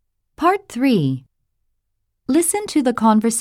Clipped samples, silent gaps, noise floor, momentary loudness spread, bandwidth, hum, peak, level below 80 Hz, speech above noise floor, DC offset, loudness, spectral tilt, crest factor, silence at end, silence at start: under 0.1%; none; -72 dBFS; 7 LU; 16.5 kHz; none; -4 dBFS; -58 dBFS; 55 dB; under 0.1%; -18 LUFS; -5 dB/octave; 16 dB; 0 s; 0.4 s